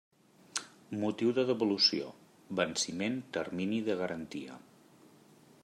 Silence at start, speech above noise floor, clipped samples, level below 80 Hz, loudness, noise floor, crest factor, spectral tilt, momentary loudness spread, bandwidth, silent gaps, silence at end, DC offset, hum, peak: 0.55 s; 27 dB; under 0.1%; -78 dBFS; -33 LUFS; -60 dBFS; 22 dB; -3.5 dB/octave; 16 LU; 14.5 kHz; none; 1.05 s; under 0.1%; none; -14 dBFS